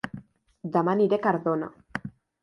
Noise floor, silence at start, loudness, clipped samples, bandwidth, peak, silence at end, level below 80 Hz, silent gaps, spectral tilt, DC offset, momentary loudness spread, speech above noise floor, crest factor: -45 dBFS; 0.05 s; -26 LUFS; under 0.1%; 11 kHz; -10 dBFS; 0.35 s; -64 dBFS; none; -8.5 dB/octave; under 0.1%; 18 LU; 21 dB; 18 dB